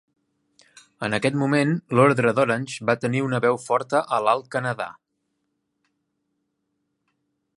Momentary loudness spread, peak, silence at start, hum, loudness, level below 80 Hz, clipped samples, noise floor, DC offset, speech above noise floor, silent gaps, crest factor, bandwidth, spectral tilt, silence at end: 9 LU; -4 dBFS; 1 s; none; -22 LUFS; -66 dBFS; under 0.1%; -76 dBFS; under 0.1%; 54 dB; none; 20 dB; 11.5 kHz; -6 dB/octave; 2.65 s